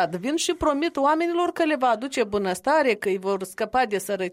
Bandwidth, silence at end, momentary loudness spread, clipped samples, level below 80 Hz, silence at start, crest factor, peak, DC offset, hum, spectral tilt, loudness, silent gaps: 16 kHz; 0 s; 5 LU; under 0.1%; -54 dBFS; 0 s; 14 dB; -10 dBFS; under 0.1%; none; -4 dB/octave; -23 LUFS; none